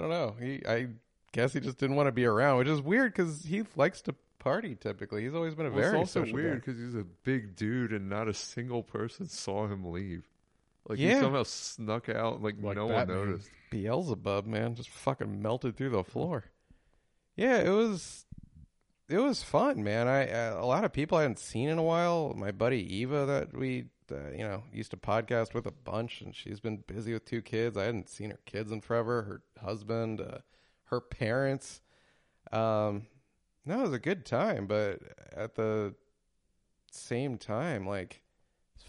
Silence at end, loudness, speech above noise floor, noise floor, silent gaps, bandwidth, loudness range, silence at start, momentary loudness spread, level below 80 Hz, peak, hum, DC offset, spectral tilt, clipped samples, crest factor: 0.75 s; -32 LUFS; 44 dB; -76 dBFS; none; 11.5 kHz; 7 LU; 0 s; 13 LU; -62 dBFS; -12 dBFS; none; under 0.1%; -6 dB/octave; under 0.1%; 20 dB